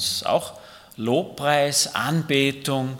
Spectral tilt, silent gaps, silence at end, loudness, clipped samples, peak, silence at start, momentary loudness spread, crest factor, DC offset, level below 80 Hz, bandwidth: -3.5 dB/octave; none; 0 s; -22 LUFS; under 0.1%; -4 dBFS; 0 s; 6 LU; 20 dB; under 0.1%; -62 dBFS; 18 kHz